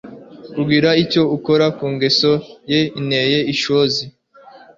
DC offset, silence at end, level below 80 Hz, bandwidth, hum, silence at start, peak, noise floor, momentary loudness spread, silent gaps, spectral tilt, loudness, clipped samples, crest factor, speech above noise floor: under 0.1%; 0.2 s; -54 dBFS; 7.6 kHz; none; 0.05 s; -2 dBFS; -44 dBFS; 8 LU; none; -5.5 dB/octave; -16 LUFS; under 0.1%; 14 dB; 28 dB